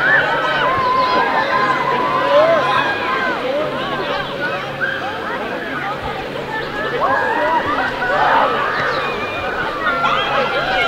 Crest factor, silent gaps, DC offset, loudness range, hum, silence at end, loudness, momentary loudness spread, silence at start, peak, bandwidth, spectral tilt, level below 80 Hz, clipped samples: 16 dB; none; under 0.1%; 6 LU; none; 0 s; -17 LUFS; 9 LU; 0 s; 0 dBFS; 16 kHz; -4.5 dB/octave; -44 dBFS; under 0.1%